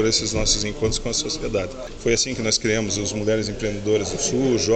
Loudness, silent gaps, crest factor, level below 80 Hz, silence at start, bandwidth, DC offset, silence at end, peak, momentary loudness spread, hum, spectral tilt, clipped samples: -22 LUFS; none; 16 dB; -36 dBFS; 0 s; 9.2 kHz; under 0.1%; 0 s; -6 dBFS; 6 LU; none; -3.5 dB/octave; under 0.1%